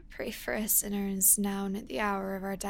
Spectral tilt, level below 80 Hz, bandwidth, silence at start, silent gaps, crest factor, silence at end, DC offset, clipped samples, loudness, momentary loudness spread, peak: -3 dB/octave; -52 dBFS; 17 kHz; 0 s; none; 20 dB; 0 s; under 0.1%; under 0.1%; -28 LUFS; 12 LU; -10 dBFS